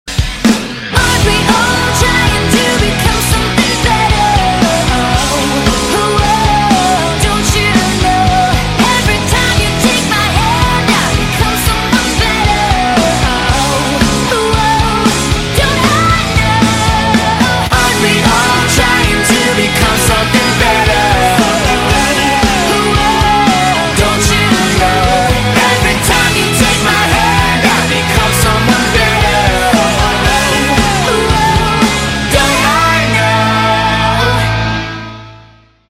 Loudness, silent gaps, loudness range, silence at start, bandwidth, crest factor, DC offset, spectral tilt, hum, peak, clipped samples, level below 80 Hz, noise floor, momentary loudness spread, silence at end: -10 LUFS; none; 1 LU; 0.05 s; 16.5 kHz; 10 dB; under 0.1%; -4 dB/octave; none; 0 dBFS; under 0.1%; -20 dBFS; -41 dBFS; 2 LU; 0.55 s